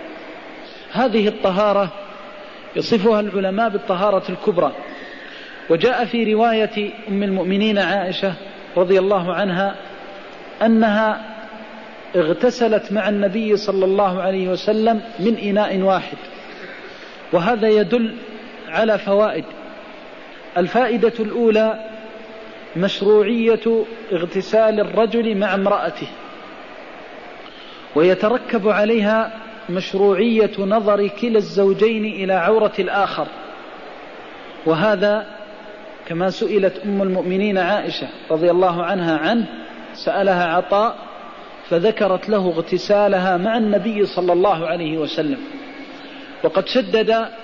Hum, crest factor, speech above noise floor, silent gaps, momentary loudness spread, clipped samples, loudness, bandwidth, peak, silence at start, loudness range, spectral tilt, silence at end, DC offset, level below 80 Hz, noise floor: none; 14 dB; 20 dB; none; 20 LU; under 0.1%; -18 LUFS; 7.2 kHz; -6 dBFS; 0 s; 3 LU; -6.5 dB/octave; 0 s; 0.4%; -56 dBFS; -38 dBFS